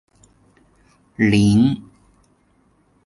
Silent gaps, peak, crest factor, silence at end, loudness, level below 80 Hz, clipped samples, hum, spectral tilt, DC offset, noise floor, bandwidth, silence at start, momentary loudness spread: none; -4 dBFS; 18 dB; 1.25 s; -17 LUFS; -46 dBFS; under 0.1%; none; -6.5 dB/octave; under 0.1%; -59 dBFS; 11.5 kHz; 1.2 s; 17 LU